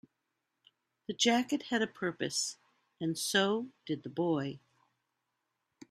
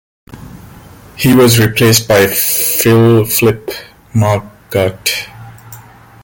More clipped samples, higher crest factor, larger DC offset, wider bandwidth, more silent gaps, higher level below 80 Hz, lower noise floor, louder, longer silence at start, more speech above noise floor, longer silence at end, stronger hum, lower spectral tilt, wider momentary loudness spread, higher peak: neither; first, 22 dB vs 12 dB; neither; second, 15 kHz vs 17.5 kHz; neither; second, -78 dBFS vs -42 dBFS; first, -84 dBFS vs -37 dBFS; second, -33 LUFS vs -11 LUFS; first, 1.1 s vs 0.3 s; first, 52 dB vs 26 dB; first, 1.35 s vs 0.4 s; neither; about the same, -3.5 dB/octave vs -4.5 dB/octave; about the same, 12 LU vs 12 LU; second, -12 dBFS vs 0 dBFS